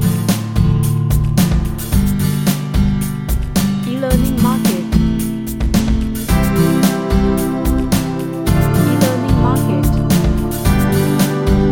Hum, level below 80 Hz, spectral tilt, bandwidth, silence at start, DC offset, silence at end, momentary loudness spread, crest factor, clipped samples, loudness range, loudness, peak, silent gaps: none; -22 dBFS; -6.5 dB/octave; 17 kHz; 0 s; under 0.1%; 0 s; 4 LU; 14 dB; under 0.1%; 2 LU; -15 LUFS; 0 dBFS; none